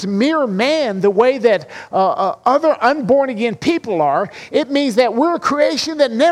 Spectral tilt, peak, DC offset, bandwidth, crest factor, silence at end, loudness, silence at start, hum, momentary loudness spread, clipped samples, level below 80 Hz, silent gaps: -5 dB/octave; -2 dBFS; under 0.1%; 13 kHz; 14 dB; 0 s; -16 LUFS; 0 s; none; 5 LU; under 0.1%; -58 dBFS; none